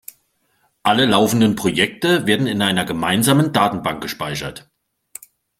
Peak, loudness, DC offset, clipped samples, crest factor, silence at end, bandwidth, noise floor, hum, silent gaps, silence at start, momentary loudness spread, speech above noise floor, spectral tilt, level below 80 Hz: 0 dBFS; -17 LUFS; under 0.1%; under 0.1%; 18 dB; 1 s; 16.5 kHz; -64 dBFS; none; none; 0.85 s; 16 LU; 47 dB; -4.5 dB/octave; -52 dBFS